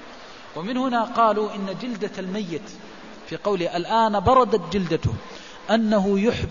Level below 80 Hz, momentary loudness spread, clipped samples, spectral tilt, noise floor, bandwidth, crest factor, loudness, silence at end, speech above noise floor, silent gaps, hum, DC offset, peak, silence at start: -46 dBFS; 21 LU; under 0.1%; -6.5 dB/octave; -42 dBFS; 7.4 kHz; 18 dB; -22 LUFS; 0 s; 20 dB; none; none; 0.4%; -6 dBFS; 0 s